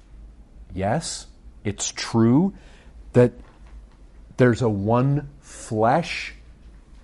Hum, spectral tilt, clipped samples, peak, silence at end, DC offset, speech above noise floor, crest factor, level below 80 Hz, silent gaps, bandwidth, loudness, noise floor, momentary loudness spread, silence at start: none; -6 dB/octave; under 0.1%; -4 dBFS; 0.05 s; under 0.1%; 25 dB; 20 dB; -46 dBFS; none; 11.5 kHz; -22 LUFS; -46 dBFS; 16 LU; 0.15 s